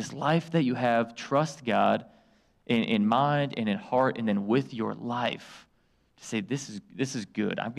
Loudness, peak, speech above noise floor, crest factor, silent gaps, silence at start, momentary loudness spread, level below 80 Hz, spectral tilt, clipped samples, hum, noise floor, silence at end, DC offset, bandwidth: -28 LUFS; -12 dBFS; 40 dB; 16 dB; none; 0 s; 9 LU; -68 dBFS; -6 dB/octave; under 0.1%; none; -68 dBFS; 0 s; under 0.1%; 11.5 kHz